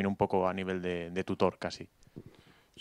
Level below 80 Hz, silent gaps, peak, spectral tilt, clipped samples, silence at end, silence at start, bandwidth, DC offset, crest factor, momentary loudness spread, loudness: -62 dBFS; none; -12 dBFS; -6.5 dB/octave; under 0.1%; 0 s; 0 s; 11.5 kHz; under 0.1%; 22 dB; 23 LU; -33 LUFS